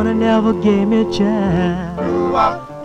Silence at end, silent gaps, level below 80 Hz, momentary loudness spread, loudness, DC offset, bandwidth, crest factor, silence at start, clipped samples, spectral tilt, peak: 0 s; none; -38 dBFS; 5 LU; -16 LUFS; under 0.1%; 8.4 kHz; 14 dB; 0 s; under 0.1%; -7.5 dB/octave; -2 dBFS